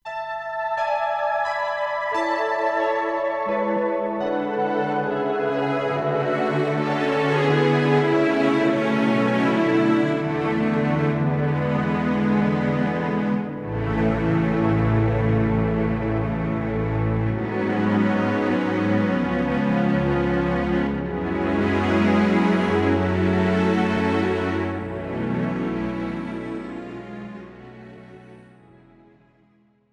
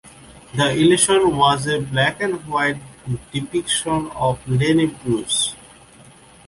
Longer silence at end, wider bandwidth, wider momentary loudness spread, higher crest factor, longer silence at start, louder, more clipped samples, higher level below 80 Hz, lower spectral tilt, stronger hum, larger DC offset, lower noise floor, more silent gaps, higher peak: first, 1.5 s vs 0.9 s; second, 9.6 kHz vs 11.5 kHz; second, 8 LU vs 12 LU; about the same, 16 dB vs 18 dB; about the same, 0.05 s vs 0.05 s; second, -22 LUFS vs -19 LUFS; neither; first, -42 dBFS vs -48 dBFS; first, -8 dB/octave vs -4 dB/octave; neither; neither; first, -60 dBFS vs -46 dBFS; neither; second, -6 dBFS vs -2 dBFS